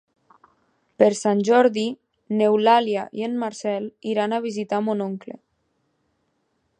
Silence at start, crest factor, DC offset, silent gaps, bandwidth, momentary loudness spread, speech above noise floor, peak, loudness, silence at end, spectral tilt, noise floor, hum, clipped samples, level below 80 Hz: 1 s; 20 dB; under 0.1%; none; 10 kHz; 12 LU; 50 dB; -2 dBFS; -22 LUFS; 1.45 s; -5 dB/octave; -71 dBFS; none; under 0.1%; -76 dBFS